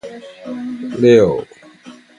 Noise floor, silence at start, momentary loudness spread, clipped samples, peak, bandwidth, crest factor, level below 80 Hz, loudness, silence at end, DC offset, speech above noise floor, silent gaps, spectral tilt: -41 dBFS; 0.05 s; 22 LU; under 0.1%; 0 dBFS; 10 kHz; 16 dB; -50 dBFS; -14 LUFS; 0.25 s; under 0.1%; 27 dB; none; -7 dB/octave